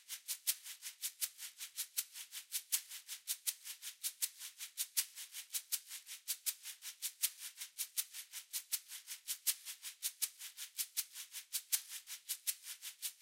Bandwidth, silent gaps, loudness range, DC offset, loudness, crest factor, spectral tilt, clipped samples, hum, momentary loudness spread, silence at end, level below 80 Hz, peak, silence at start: 16.5 kHz; none; 1 LU; under 0.1%; -41 LUFS; 26 dB; 7.5 dB/octave; under 0.1%; none; 10 LU; 0 s; under -90 dBFS; -18 dBFS; 0 s